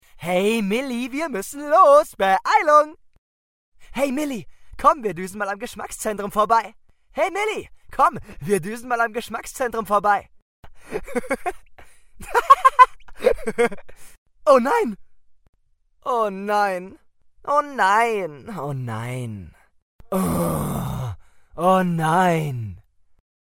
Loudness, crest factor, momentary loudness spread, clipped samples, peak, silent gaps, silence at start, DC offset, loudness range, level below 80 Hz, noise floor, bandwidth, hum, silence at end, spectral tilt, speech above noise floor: -21 LUFS; 22 dB; 16 LU; under 0.1%; 0 dBFS; 3.18-3.72 s, 10.42-10.63 s, 14.18-14.26 s, 15.49-15.53 s, 19.82-19.99 s; 0.15 s; under 0.1%; 7 LU; -48 dBFS; -60 dBFS; 16.5 kHz; none; 0.7 s; -5.5 dB/octave; 39 dB